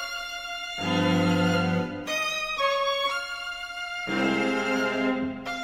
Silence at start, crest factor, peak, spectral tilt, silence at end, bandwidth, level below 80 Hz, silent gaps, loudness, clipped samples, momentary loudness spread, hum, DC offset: 0 s; 14 dB; -12 dBFS; -5 dB/octave; 0 s; 16.5 kHz; -56 dBFS; none; -26 LUFS; under 0.1%; 9 LU; none; under 0.1%